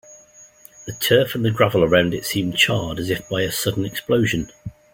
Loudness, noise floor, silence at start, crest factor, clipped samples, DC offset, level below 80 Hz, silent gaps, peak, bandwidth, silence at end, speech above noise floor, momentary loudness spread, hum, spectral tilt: -19 LUFS; -48 dBFS; 0.1 s; 18 dB; under 0.1%; under 0.1%; -48 dBFS; none; -2 dBFS; 17 kHz; 0.25 s; 28 dB; 9 LU; none; -4.5 dB/octave